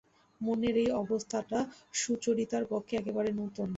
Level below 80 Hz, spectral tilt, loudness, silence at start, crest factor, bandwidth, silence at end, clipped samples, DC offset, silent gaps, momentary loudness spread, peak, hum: -64 dBFS; -4.5 dB/octave; -33 LUFS; 0.4 s; 14 dB; 8 kHz; 0 s; under 0.1%; under 0.1%; none; 5 LU; -18 dBFS; none